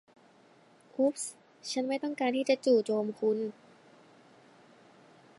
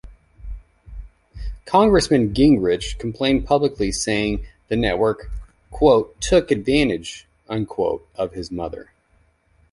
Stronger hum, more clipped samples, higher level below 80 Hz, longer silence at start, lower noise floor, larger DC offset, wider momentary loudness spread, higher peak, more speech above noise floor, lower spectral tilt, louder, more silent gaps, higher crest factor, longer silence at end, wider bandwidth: neither; neither; second, -88 dBFS vs -36 dBFS; first, 1 s vs 0.05 s; about the same, -61 dBFS vs -60 dBFS; neither; second, 13 LU vs 21 LU; second, -14 dBFS vs -2 dBFS; second, 31 dB vs 41 dB; about the same, -4 dB/octave vs -5 dB/octave; second, -31 LUFS vs -20 LUFS; neither; about the same, 20 dB vs 18 dB; first, 1.9 s vs 0.9 s; about the same, 11.5 kHz vs 11.5 kHz